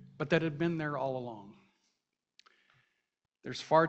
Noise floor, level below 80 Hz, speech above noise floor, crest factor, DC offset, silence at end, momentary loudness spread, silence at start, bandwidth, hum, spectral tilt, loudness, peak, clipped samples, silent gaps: -85 dBFS; -70 dBFS; 53 dB; 24 dB; under 0.1%; 0 s; 16 LU; 0 s; 8.2 kHz; none; -6.5 dB/octave; -34 LUFS; -12 dBFS; under 0.1%; none